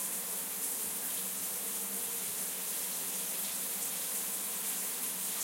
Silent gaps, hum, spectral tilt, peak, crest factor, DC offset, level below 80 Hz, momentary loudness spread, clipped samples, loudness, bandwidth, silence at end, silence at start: none; none; 0 dB/octave; -22 dBFS; 14 dB; under 0.1%; -88 dBFS; 1 LU; under 0.1%; -34 LUFS; 16.5 kHz; 0 s; 0 s